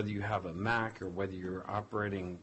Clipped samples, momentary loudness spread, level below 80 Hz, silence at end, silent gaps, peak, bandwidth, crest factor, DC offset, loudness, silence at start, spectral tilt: under 0.1%; 6 LU; -56 dBFS; 0 s; none; -18 dBFS; 8.2 kHz; 18 dB; under 0.1%; -36 LUFS; 0 s; -7 dB/octave